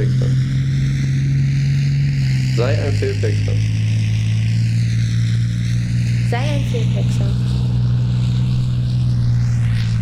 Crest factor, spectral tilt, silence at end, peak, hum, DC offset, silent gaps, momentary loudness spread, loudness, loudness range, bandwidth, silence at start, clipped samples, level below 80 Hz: 10 dB; -7 dB/octave; 0 s; -6 dBFS; none; under 0.1%; none; 2 LU; -18 LUFS; 1 LU; 9.8 kHz; 0 s; under 0.1%; -30 dBFS